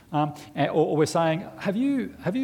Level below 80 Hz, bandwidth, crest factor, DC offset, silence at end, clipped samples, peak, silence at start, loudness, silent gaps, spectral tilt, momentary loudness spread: -62 dBFS; 16.5 kHz; 16 dB; under 0.1%; 0 s; under 0.1%; -10 dBFS; 0.1 s; -25 LUFS; none; -6.5 dB/octave; 7 LU